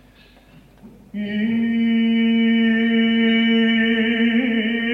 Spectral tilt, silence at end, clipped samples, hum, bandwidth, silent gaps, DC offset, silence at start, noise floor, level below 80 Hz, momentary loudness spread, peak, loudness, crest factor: -7 dB/octave; 0 s; under 0.1%; none; 3.9 kHz; none; under 0.1%; 0.85 s; -49 dBFS; -54 dBFS; 6 LU; -8 dBFS; -18 LUFS; 10 dB